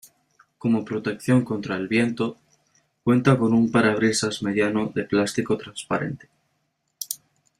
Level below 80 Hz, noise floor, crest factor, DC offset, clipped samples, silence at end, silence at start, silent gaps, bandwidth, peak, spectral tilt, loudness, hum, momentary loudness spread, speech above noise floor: -60 dBFS; -73 dBFS; 20 dB; under 0.1%; under 0.1%; 0.45 s; 0.65 s; none; 15.5 kHz; -4 dBFS; -5.5 dB/octave; -23 LUFS; none; 13 LU; 51 dB